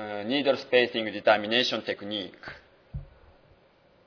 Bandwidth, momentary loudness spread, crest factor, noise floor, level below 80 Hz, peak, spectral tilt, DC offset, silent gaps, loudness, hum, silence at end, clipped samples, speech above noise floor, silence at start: 5.4 kHz; 21 LU; 22 dB; -61 dBFS; -54 dBFS; -6 dBFS; -4.5 dB/octave; under 0.1%; none; -26 LUFS; none; 1 s; under 0.1%; 34 dB; 0 s